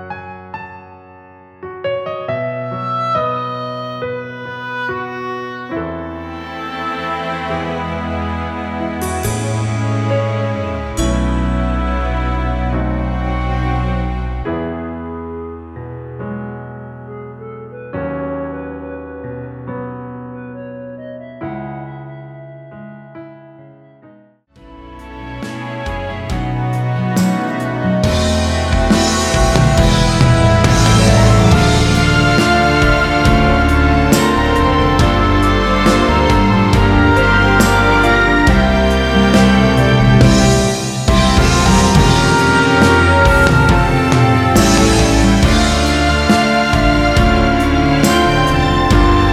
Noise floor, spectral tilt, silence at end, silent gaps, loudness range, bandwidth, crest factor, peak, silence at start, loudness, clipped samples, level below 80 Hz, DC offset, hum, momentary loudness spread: -47 dBFS; -5.5 dB/octave; 0 s; none; 17 LU; 16 kHz; 14 dB; 0 dBFS; 0 s; -13 LUFS; under 0.1%; -22 dBFS; under 0.1%; none; 19 LU